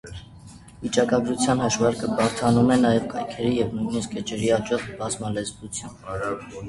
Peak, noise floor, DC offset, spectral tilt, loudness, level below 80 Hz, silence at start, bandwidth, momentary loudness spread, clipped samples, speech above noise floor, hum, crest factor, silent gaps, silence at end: -6 dBFS; -45 dBFS; under 0.1%; -5 dB/octave; -24 LUFS; -50 dBFS; 0.05 s; 11.5 kHz; 14 LU; under 0.1%; 22 dB; none; 18 dB; none; 0 s